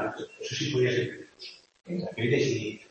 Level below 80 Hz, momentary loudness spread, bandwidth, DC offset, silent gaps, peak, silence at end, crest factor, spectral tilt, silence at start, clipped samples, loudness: -66 dBFS; 17 LU; 8.6 kHz; under 0.1%; none; -12 dBFS; 0.05 s; 18 dB; -5 dB/octave; 0 s; under 0.1%; -29 LUFS